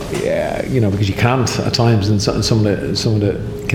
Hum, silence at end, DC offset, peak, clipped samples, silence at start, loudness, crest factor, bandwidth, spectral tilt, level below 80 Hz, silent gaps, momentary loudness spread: none; 0 s; under 0.1%; -2 dBFS; under 0.1%; 0 s; -16 LUFS; 14 dB; 15.5 kHz; -5.5 dB/octave; -36 dBFS; none; 5 LU